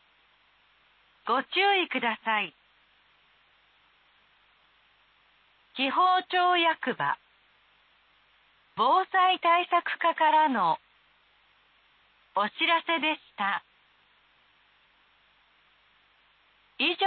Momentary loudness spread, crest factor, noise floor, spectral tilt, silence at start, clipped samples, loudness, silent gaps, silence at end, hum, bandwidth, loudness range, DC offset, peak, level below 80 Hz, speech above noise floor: 10 LU; 18 dB; -64 dBFS; -7 dB/octave; 1.25 s; under 0.1%; -26 LUFS; none; 0 s; none; 4.7 kHz; 10 LU; under 0.1%; -12 dBFS; -82 dBFS; 39 dB